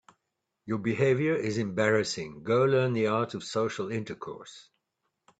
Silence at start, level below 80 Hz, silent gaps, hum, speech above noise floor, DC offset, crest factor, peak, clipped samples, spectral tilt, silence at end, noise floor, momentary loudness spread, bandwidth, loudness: 0.65 s; -68 dBFS; none; none; 55 dB; under 0.1%; 18 dB; -10 dBFS; under 0.1%; -6 dB/octave; 0.8 s; -83 dBFS; 14 LU; 9 kHz; -28 LUFS